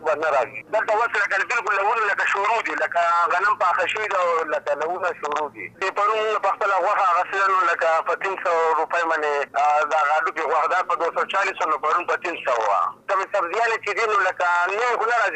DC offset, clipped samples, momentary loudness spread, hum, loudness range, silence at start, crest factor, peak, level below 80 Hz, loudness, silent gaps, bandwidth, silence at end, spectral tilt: under 0.1%; under 0.1%; 5 LU; none; 2 LU; 0 s; 10 dB; -12 dBFS; -72 dBFS; -21 LUFS; none; 9.4 kHz; 0 s; -2 dB/octave